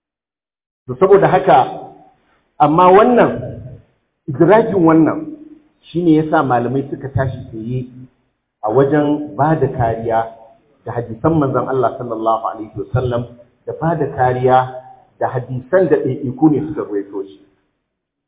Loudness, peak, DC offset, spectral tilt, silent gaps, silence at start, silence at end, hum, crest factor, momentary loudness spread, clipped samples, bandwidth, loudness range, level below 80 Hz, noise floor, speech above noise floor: -15 LUFS; 0 dBFS; under 0.1%; -12 dB/octave; none; 0.9 s; 0.95 s; none; 16 dB; 17 LU; under 0.1%; 4 kHz; 6 LU; -44 dBFS; under -90 dBFS; over 76 dB